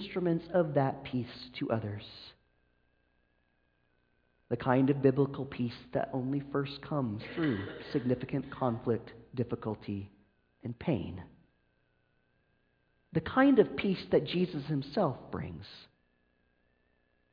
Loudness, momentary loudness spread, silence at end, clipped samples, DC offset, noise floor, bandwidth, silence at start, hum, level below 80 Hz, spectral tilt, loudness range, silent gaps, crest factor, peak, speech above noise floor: -32 LUFS; 16 LU; 1.5 s; under 0.1%; under 0.1%; -74 dBFS; 5.2 kHz; 0 s; none; -62 dBFS; -9.5 dB/octave; 10 LU; none; 22 dB; -12 dBFS; 42 dB